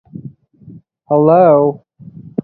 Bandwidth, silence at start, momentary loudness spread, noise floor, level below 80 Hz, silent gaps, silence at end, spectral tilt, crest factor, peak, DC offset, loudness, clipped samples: 4.4 kHz; 0.25 s; 25 LU; -40 dBFS; -58 dBFS; none; 0.65 s; -12.5 dB/octave; 14 dB; 0 dBFS; under 0.1%; -11 LUFS; under 0.1%